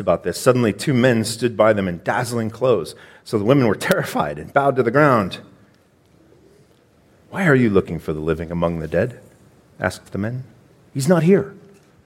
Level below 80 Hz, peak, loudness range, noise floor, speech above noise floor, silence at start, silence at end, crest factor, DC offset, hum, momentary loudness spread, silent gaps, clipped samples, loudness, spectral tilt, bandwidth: -48 dBFS; -2 dBFS; 4 LU; -55 dBFS; 37 dB; 0 s; 0.45 s; 18 dB; under 0.1%; none; 12 LU; none; under 0.1%; -19 LUFS; -6 dB/octave; 16.5 kHz